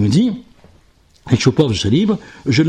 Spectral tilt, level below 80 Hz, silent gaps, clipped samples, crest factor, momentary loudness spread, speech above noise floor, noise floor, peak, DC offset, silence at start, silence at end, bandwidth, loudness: -6 dB/octave; -44 dBFS; none; under 0.1%; 16 dB; 6 LU; 37 dB; -51 dBFS; -2 dBFS; under 0.1%; 0 s; 0 s; 10 kHz; -16 LUFS